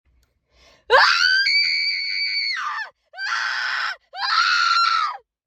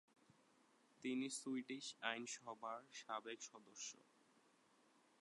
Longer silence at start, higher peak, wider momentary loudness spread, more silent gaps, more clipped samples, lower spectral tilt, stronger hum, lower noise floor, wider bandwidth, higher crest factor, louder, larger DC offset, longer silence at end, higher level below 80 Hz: about the same, 0.9 s vs 1 s; first, -2 dBFS vs -26 dBFS; first, 13 LU vs 8 LU; neither; neither; second, 2.5 dB/octave vs -2 dB/octave; neither; second, -63 dBFS vs -76 dBFS; first, 15.5 kHz vs 11 kHz; second, 18 dB vs 26 dB; first, -18 LUFS vs -49 LUFS; neither; second, 0.3 s vs 1.2 s; first, -64 dBFS vs under -90 dBFS